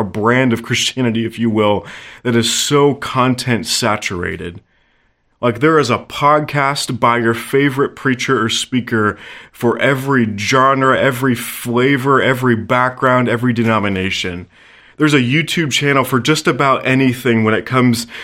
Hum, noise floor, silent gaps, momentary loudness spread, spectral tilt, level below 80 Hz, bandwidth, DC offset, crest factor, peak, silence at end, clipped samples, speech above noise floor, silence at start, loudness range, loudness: none; -59 dBFS; none; 6 LU; -4.5 dB/octave; -52 dBFS; 16.5 kHz; under 0.1%; 14 dB; 0 dBFS; 0 s; under 0.1%; 44 dB; 0 s; 3 LU; -15 LUFS